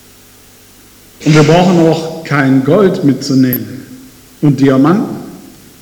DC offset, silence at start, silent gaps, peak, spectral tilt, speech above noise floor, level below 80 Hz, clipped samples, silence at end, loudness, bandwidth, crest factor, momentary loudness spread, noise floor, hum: under 0.1%; 1.2 s; none; 0 dBFS; -7 dB/octave; 31 dB; -46 dBFS; under 0.1%; 0.45 s; -10 LUFS; 19.5 kHz; 12 dB; 14 LU; -40 dBFS; 50 Hz at -45 dBFS